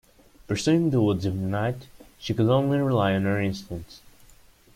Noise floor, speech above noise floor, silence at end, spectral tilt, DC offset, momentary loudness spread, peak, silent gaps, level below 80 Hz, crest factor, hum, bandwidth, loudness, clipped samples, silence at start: -54 dBFS; 30 dB; 0.8 s; -7 dB/octave; under 0.1%; 15 LU; -10 dBFS; none; -54 dBFS; 16 dB; none; 16 kHz; -24 LUFS; under 0.1%; 0.5 s